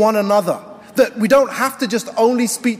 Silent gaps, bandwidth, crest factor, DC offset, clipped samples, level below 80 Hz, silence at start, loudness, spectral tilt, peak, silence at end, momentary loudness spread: none; 16 kHz; 14 dB; under 0.1%; under 0.1%; -58 dBFS; 0 s; -17 LUFS; -4 dB/octave; -2 dBFS; 0 s; 9 LU